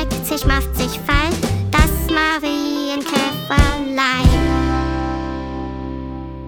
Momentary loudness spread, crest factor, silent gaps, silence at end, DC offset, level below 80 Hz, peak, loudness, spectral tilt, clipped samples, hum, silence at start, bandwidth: 11 LU; 16 dB; none; 0 s; under 0.1%; -22 dBFS; -2 dBFS; -18 LUFS; -5 dB/octave; under 0.1%; none; 0 s; over 20 kHz